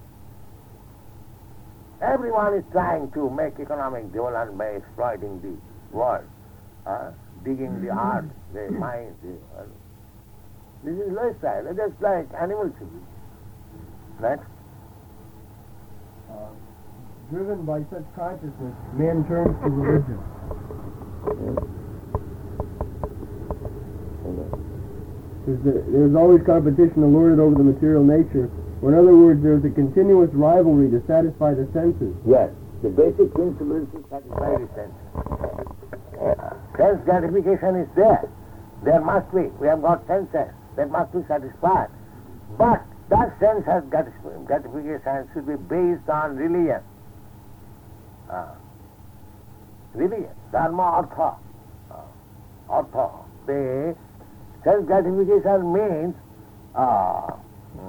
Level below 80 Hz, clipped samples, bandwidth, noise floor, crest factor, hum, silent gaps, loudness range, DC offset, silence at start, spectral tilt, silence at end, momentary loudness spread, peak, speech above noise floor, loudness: -42 dBFS; under 0.1%; 19.5 kHz; -47 dBFS; 18 dB; 50 Hz at -50 dBFS; none; 17 LU; under 0.1%; 0 s; -10.5 dB/octave; 0 s; 20 LU; -2 dBFS; 27 dB; -21 LUFS